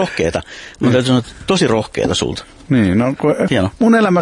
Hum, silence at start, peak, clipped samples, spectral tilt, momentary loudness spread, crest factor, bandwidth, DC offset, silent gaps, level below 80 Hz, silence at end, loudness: none; 0 s; -2 dBFS; under 0.1%; -5.5 dB/octave; 7 LU; 14 dB; 11.5 kHz; under 0.1%; none; -42 dBFS; 0 s; -15 LUFS